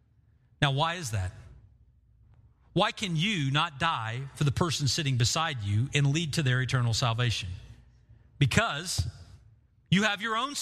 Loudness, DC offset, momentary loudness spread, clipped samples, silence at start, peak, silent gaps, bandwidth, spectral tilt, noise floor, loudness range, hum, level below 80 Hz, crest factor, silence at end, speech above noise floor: -28 LUFS; under 0.1%; 8 LU; under 0.1%; 0.6 s; -8 dBFS; none; 14.5 kHz; -4.5 dB/octave; -63 dBFS; 3 LU; none; -52 dBFS; 22 dB; 0 s; 36 dB